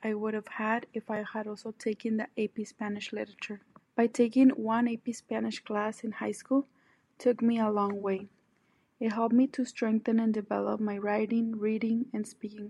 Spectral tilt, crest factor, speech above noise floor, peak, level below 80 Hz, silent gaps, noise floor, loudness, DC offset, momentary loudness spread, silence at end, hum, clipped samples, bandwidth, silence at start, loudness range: -6 dB/octave; 18 dB; 41 dB; -12 dBFS; -80 dBFS; none; -71 dBFS; -31 LUFS; under 0.1%; 11 LU; 0 s; none; under 0.1%; 11.5 kHz; 0 s; 5 LU